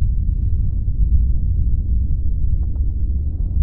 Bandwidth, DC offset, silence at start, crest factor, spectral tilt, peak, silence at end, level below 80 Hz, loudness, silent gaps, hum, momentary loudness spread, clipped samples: 0.8 kHz; 2%; 0 s; 12 dB; -14.5 dB/octave; -4 dBFS; 0 s; -18 dBFS; -22 LUFS; none; none; 4 LU; under 0.1%